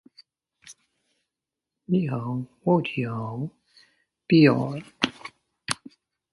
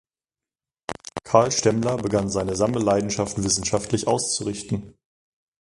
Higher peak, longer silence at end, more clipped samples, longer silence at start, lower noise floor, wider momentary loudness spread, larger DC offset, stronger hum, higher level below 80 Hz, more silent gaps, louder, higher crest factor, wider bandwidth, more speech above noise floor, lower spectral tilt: about the same, -2 dBFS vs 0 dBFS; about the same, 0.6 s vs 0.7 s; neither; second, 0.65 s vs 0.9 s; about the same, -87 dBFS vs under -90 dBFS; first, 18 LU vs 13 LU; neither; neither; second, -66 dBFS vs -48 dBFS; neither; about the same, -25 LUFS vs -23 LUFS; about the same, 24 dB vs 24 dB; about the same, 11.5 kHz vs 11.5 kHz; second, 64 dB vs over 68 dB; first, -6 dB/octave vs -4.5 dB/octave